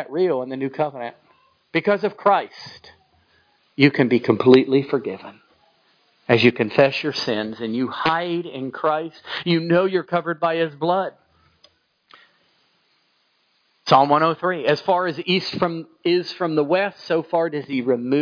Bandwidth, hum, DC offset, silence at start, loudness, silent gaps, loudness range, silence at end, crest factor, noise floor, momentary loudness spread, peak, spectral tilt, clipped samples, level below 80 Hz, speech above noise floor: 5.4 kHz; none; under 0.1%; 0 s; -20 LUFS; none; 6 LU; 0 s; 20 dB; -65 dBFS; 11 LU; 0 dBFS; -7 dB/octave; under 0.1%; -68 dBFS; 45 dB